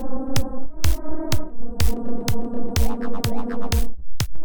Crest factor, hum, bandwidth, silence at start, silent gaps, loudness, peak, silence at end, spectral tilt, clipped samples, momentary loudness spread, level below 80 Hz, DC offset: 12 dB; none; 19.5 kHz; 0 s; none; -27 LUFS; -6 dBFS; 0 s; -5 dB/octave; under 0.1%; 5 LU; -28 dBFS; 10%